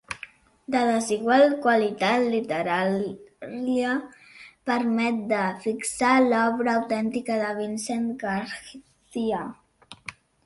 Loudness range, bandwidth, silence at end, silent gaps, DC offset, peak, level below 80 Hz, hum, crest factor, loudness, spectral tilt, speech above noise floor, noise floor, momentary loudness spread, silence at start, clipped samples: 5 LU; 11.5 kHz; 0.35 s; none; under 0.1%; -6 dBFS; -64 dBFS; none; 18 dB; -24 LUFS; -4.5 dB/octave; 23 dB; -47 dBFS; 19 LU; 0.1 s; under 0.1%